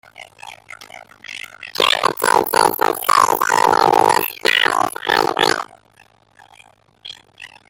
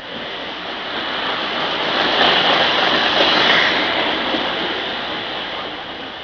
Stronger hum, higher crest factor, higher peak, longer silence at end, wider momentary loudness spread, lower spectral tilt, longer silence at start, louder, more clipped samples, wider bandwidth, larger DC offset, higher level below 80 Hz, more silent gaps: neither; about the same, 18 dB vs 18 dB; about the same, 0 dBFS vs -2 dBFS; first, 0.2 s vs 0 s; first, 23 LU vs 13 LU; second, -1.5 dB/octave vs -3.5 dB/octave; first, 0.2 s vs 0 s; about the same, -15 LUFS vs -17 LUFS; neither; first, 17 kHz vs 5.4 kHz; neither; second, -58 dBFS vs -52 dBFS; neither